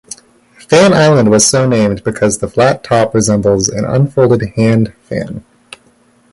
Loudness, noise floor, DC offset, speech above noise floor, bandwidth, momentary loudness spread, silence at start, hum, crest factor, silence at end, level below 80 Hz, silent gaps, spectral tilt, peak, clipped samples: -11 LUFS; -50 dBFS; under 0.1%; 39 dB; 11.5 kHz; 13 LU; 0.7 s; none; 12 dB; 0.9 s; -40 dBFS; none; -5 dB/octave; 0 dBFS; under 0.1%